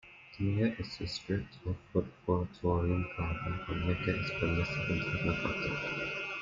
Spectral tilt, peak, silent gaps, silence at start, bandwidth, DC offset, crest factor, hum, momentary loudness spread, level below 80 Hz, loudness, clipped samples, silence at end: -7 dB/octave; -16 dBFS; none; 0.05 s; 7.6 kHz; under 0.1%; 18 dB; none; 6 LU; -52 dBFS; -34 LUFS; under 0.1%; 0 s